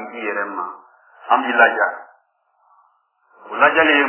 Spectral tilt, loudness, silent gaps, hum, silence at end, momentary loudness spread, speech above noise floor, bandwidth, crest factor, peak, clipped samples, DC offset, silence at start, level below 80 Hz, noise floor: -6 dB/octave; -17 LUFS; none; none; 0 s; 18 LU; 46 dB; 3.2 kHz; 20 dB; 0 dBFS; under 0.1%; under 0.1%; 0 s; -68 dBFS; -63 dBFS